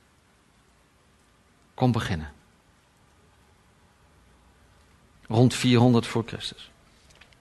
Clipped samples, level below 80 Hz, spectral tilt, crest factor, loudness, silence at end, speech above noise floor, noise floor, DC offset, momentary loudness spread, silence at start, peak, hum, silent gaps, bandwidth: under 0.1%; -54 dBFS; -6 dB/octave; 22 dB; -24 LUFS; 0.75 s; 39 dB; -61 dBFS; under 0.1%; 21 LU; 1.8 s; -6 dBFS; none; none; 12 kHz